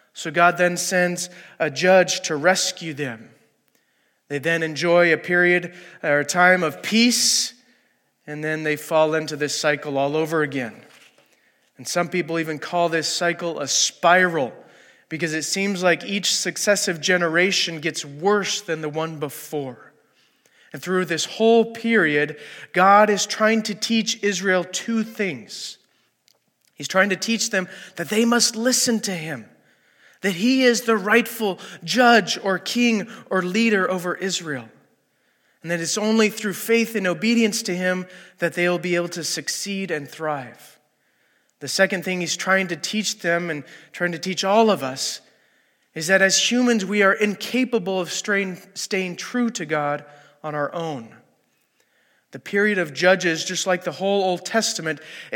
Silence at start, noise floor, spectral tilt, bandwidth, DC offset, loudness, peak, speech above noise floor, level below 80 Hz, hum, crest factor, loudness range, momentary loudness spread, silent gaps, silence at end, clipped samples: 0.15 s; -66 dBFS; -3 dB/octave; 17.5 kHz; under 0.1%; -21 LUFS; -2 dBFS; 45 dB; -80 dBFS; none; 20 dB; 6 LU; 13 LU; none; 0 s; under 0.1%